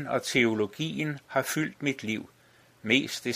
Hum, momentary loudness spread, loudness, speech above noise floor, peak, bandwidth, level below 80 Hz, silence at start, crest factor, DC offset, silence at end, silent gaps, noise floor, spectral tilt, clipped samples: none; 9 LU; -28 LUFS; 31 dB; -8 dBFS; 15.5 kHz; -70 dBFS; 0 s; 22 dB; under 0.1%; 0 s; none; -59 dBFS; -4 dB/octave; under 0.1%